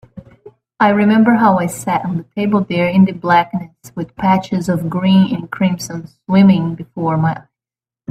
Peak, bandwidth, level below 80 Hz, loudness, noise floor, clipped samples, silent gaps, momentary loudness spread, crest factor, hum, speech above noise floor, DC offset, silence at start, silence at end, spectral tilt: 0 dBFS; 13.5 kHz; -52 dBFS; -15 LUFS; under -90 dBFS; under 0.1%; none; 15 LU; 14 dB; none; over 76 dB; under 0.1%; 0.15 s; 0.7 s; -7 dB/octave